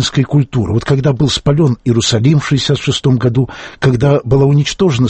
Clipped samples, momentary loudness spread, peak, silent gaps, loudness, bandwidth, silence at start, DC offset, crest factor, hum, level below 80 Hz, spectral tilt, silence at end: under 0.1%; 4 LU; 0 dBFS; none; -13 LUFS; 8.6 kHz; 0 s; under 0.1%; 12 dB; none; -36 dBFS; -6 dB/octave; 0 s